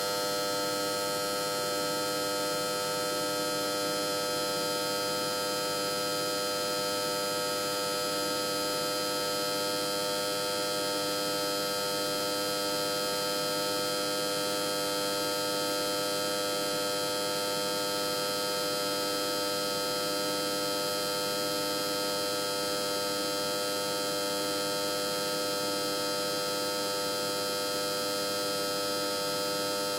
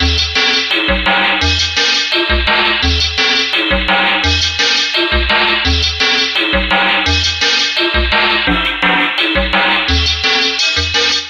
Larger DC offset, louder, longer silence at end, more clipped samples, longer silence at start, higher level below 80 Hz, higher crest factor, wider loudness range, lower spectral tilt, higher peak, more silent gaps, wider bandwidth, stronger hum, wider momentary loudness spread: neither; second, -30 LUFS vs -11 LUFS; about the same, 0 s vs 0 s; neither; about the same, 0 s vs 0 s; second, -68 dBFS vs -24 dBFS; about the same, 12 dB vs 14 dB; about the same, 1 LU vs 0 LU; about the same, -2 dB/octave vs -3 dB/octave; second, -20 dBFS vs 0 dBFS; neither; first, 16 kHz vs 11 kHz; neither; about the same, 1 LU vs 2 LU